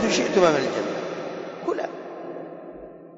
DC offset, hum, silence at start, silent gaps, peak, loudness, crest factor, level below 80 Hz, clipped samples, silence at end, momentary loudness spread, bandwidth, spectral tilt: under 0.1%; none; 0 s; none; -8 dBFS; -24 LUFS; 18 dB; -60 dBFS; under 0.1%; 0 s; 20 LU; 7.8 kHz; -4 dB/octave